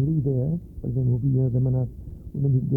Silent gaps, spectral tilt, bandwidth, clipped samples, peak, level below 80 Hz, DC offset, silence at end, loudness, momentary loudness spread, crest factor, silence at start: none; -14 dB/octave; 1.1 kHz; under 0.1%; -12 dBFS; -42 dBFS; under 0.1%; 0 s; -25 LUFS; 9 LU; 12 dB; 0 s